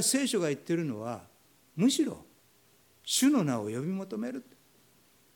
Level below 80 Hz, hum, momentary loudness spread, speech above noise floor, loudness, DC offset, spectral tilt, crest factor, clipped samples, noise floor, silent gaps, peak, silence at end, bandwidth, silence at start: -76 dBFS; none; 18 LU; 35 dB; -30 LUFS; under 0.1%; -4 dB/octave; 18 dB; under 0.1%; -64 dBFS; none; -14 dBFS; 0.95 s; 19 kHz; 0 s